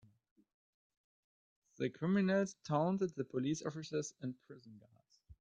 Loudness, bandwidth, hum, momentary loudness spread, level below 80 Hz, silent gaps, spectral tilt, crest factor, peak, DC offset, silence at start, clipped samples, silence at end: -38 LUFS; 8.2 kHz; none; 13 LU; -76 dBFS; none; -6.5 dB/octave; 20 dB; -20 dBFS; under 0.1%; 1.8 s; under 0.1%; 0.1 s